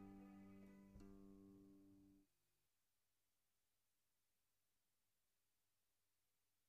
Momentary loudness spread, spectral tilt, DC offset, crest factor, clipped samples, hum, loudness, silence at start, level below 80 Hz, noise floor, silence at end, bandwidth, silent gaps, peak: 5 LU; -7.5 dB/octave; under 0.1%; 18 dB; under 0.1%; none; -66 LUFS; 0 s; -80 dBFS; under -90 dBFS; 4.2 s; 7.2 kHz; none; -50 dBFS